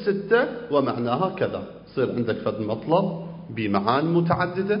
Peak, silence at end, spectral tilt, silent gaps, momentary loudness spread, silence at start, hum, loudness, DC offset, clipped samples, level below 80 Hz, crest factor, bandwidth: -4 dBFS; 0 s; -11.5 dB/octave; none; 8 LU; 0 s; none; -24 LUFS; under 0.1%; under 0.1%; -56 dBFS; 20 dB; 5.4 kHz